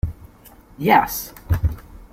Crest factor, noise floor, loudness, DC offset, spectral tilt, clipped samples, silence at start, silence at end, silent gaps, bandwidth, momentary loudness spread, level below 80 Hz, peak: 20 dB; -47 dBFS; -21 LUFS; under 0.1%; -5.5 dB/octave; under 0.1%; 0.05 s; 0.1 s; none; 16.5 kHz; 13 LU; -32 dBFS; -2 dBFS